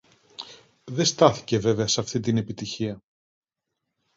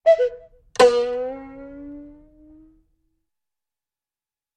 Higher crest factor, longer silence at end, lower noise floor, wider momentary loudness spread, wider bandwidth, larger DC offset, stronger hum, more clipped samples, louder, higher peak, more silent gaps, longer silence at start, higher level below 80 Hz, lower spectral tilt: about the same, 24 dB vs 22 dB; second, 1.2 s vs 2.5 s; second, -83 dBFS vs under -90 dBFS; about the same, 21 LU vs 23 LU; second, 7.8 kHz vs 10.5 kHz; neither; neither; neither; second, -24 LUFS vs -20 LUFS; about the same, -2 dBFS vs -2 dBFS; neither; first, 0.4 s vs 0.05 s; about the same, -58 dBFS vs -56 dBFS; first, -4.5 dB/octave vs -3 dB/octave